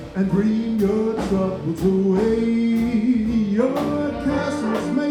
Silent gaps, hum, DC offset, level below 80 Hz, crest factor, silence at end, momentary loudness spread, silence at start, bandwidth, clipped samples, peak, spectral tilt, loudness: none; none; under 0.1%; -42 dBFS; 12 dB; 0 s; 4 LU; 0 s; 14 kHz; under 0.1%; -8 dBFS; -7.5 dB/octave; -21 LUFS